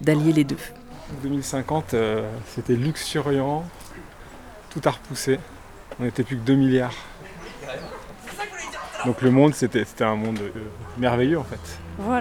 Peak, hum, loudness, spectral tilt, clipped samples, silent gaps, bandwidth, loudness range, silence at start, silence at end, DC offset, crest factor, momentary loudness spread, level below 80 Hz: -4 dBFS; none; -24 LUFS; -6 dB/octave; under 0.1%; none; 18 kHz; 4 LU; 0 s; 0 s; under 0.1%; 20 dB; 21 LU; -48 dBFS